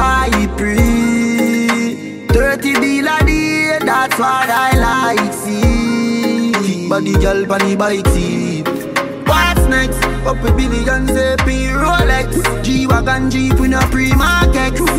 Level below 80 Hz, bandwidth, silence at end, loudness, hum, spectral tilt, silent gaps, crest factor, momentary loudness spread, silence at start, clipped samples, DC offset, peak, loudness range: -20 dBFS; 16.5 kHz; 0 s; -14 LUFS; none; -5 dB/octave; none; 12 dB; 4 LU; 0 s; under 0.1%; under 0.1%; 0 dBFS; 1 LU